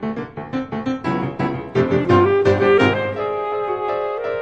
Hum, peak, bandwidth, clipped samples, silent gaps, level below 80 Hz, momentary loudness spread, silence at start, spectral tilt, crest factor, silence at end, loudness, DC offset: none; -2 dBFS; 8 kHz; under 0.1%; none; -52 dBFS; 11 LU; 0 s; -7.5 dB/octave; 16 dB; 0 s; -19 LUFS; 0.1%